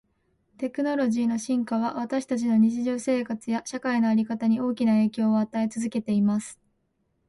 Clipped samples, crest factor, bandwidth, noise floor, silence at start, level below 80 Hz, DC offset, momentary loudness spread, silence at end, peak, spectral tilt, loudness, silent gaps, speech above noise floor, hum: under 0.1%; 12 dB; 11.5 kHz; -73 dBFS; 0.6 s; -68 dBFS; under 0.1%; 7 LU; 0.75 s; -12 dBFS; -6 dB/octave; -25 LUFS; none; 48 dB; none